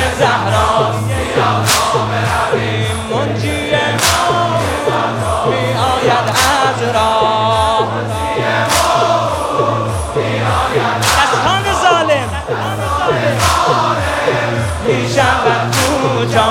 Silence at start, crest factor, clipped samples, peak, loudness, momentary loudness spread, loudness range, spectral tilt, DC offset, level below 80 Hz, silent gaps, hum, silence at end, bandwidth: 0 s; 14 dB; under 0.1%; 0 dBFS; -13 LUFS; 5 LU; 1 LU; -4 dB/octave; under 0.1%; -34 dBFS; none; none; 0 s; 17.5 kHz